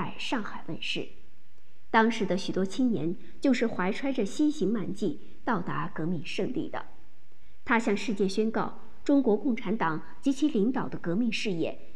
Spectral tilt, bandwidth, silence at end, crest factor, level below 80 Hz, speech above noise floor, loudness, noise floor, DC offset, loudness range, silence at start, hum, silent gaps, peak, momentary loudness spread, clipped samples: -5.5 dB/octave; 11 kHz; 0 s; 20 dB; -62 dBFS; 36 dB; -29 LUFS; -64 dBFS; 2%; 4 LU; 0 s; none; none; -10 dBFS; 9 LU; under 0.1%